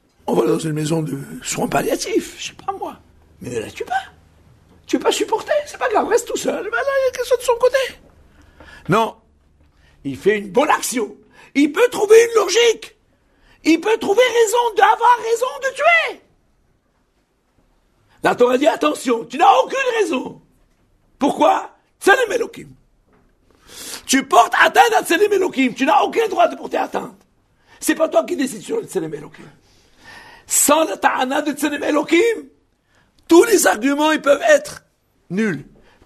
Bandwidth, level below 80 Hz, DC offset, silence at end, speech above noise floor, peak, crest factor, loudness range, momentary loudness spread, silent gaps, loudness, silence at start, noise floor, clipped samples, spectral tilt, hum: 13.5 kHz; -56 dBFS; under 0.1%; 0.45 s; 47 dB; 0 dBFS; 18 dB; 7 LU; 14 LU; none; -17 LUFS; 0.25 s; -63 dBFS; under 0.1%; -3.5 dB/octave; none